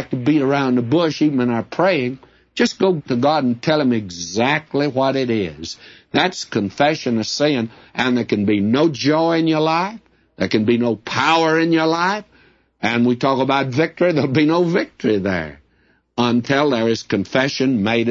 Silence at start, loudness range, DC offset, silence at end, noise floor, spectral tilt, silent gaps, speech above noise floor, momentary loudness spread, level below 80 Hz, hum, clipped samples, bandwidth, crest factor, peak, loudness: 0 s; 2 LU; under 0.1%; 0 s; -59 dBFS; -5.5 dB/octave; none; 42 dB; 7 LU; -56 dBFS; none; under 0.1%; 7.8 kHz; 16 dB; -2 dBFS; -18 LUFS